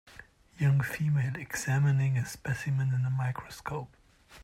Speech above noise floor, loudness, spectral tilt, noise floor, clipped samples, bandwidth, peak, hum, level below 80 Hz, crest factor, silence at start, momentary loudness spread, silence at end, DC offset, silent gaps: 25 dB; -30 LUFS; -6.5 dB/octave; -54 dBFS; under 0.1%; 15.5 kHz; -16 dBFS; none; -60 dBFS; 14 dB; 0.05 s; 12 LU; 0 s; under 0.1%; none